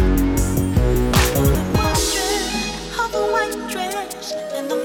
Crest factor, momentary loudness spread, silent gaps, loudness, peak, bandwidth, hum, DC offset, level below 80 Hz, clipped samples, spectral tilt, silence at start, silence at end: 16 dB; 9 LU; none; -20 LUFS; -4 dBFS; over 20 kHz; none; under 0.1%; -26 dBFS; under 0.1%; -4.5 dB/octave; 0 s; 0 s